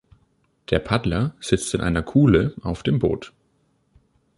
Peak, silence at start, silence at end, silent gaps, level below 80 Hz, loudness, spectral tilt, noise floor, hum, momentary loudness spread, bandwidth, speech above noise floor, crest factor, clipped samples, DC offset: -2 dBFS; 0.7 s; 1.1 s; none; -38 dBFS; -22 LUFS; -6.5 dB/octave; -65 dBFS; none; 9 LU; 11.5 kHz; 45 dB; 20 dB; under 0.1%; under 0.1%